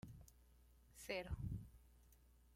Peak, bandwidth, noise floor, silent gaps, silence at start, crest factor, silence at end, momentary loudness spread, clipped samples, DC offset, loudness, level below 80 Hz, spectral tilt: -30 dBFS; 16.5 kHz; -70 dBFS; none; 0.05 s; 24 dB; 0 s; 19 LU; under 0.1%; under 0.1%; -50 LUFS; -60 dBFS; -5.5 dB/octave